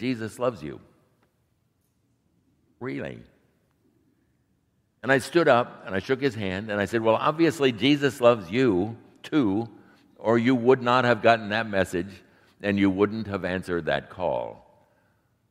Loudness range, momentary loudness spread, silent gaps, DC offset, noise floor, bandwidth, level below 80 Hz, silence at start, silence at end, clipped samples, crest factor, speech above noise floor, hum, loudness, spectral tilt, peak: 19 LU; 14 LU; none; under 0.1%; -70 dBFS; 15.5 kHz; -62 dBFS; 0 s; 0.95 s; under 0.1%; 24 dB; 46 dB; none; -24 LUFS; -6 dB/octave; -2 dBFS